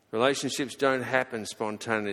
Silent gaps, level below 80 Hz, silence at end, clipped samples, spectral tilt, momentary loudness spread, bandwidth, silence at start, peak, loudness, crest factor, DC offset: none; -70 dBFS; 0 s; under 0.1%; -3.5 dB/octave; 8 LU; 16 kHz; 0.15 s; -8 dBFS; -28 LUFS; 22 dB; under 0.1%